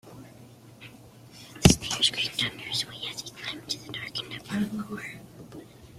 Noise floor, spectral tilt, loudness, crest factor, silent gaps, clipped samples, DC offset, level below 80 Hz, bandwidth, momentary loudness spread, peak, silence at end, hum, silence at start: -50 dBFS; -3.5 dB/octave; -28 LUFS; 30 dB; none; under 0.1%; under 0.1%; -46 dBFS; 16 kHz; 26 LU; -2 dBFS; 0 s; none; 0.05 s